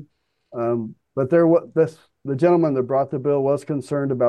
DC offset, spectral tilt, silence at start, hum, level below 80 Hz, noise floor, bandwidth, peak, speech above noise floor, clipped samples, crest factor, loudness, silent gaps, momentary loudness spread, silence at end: under 0.1%; -9 dB/octave; 0 s; none; -66 dBFS; -56 dBFS; 10 kHz; -6 dBFS; 37 dB; under 0.1%; 14 dB; -21 LUFS; none; 11 LU; 0 s